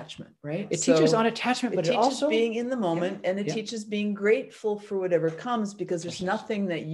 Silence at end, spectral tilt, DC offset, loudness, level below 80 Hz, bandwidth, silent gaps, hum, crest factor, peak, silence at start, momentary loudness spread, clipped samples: 0 s; -5 dB/octave; under 0.1%; -27 LUFS; -70 dBFS; 12 kHz; none; none; 18 dB; -8 dBFS; 0 s; 9 LU; under 0.1%